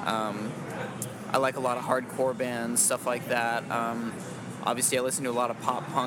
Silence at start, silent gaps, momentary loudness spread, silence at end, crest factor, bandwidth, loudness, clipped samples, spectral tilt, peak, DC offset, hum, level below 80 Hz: 0 s; none; 11 LU; 0 s; 20 dB; 17.5 kHz; -29 LUFS; under 0.1%; -3 dB/octave; -10 dBFS; under 0.1%; none; -72 dBFS